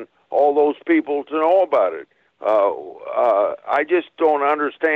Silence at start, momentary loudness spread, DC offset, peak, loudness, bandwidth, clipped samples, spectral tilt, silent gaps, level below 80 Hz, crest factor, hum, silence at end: 0 s; 8 LU; under 0.1%; -8 dBFS; -19 LUFS; 5.2 kHz; under 0.1%; -6 dB/octave; none; -72 dBFS; 12 dB; none; 0 s